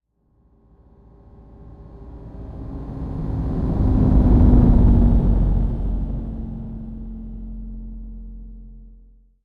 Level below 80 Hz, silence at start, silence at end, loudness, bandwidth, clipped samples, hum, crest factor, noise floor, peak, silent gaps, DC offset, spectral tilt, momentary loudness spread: -22 dBFS; 1.5 s; 0.55 s; -19 LUFS; 2.3 kHz; under 0.1%; none; 16 dB; -61 dBFS; -4 dBFS; none; under 0.1%; -12 dB/octave; 24 LU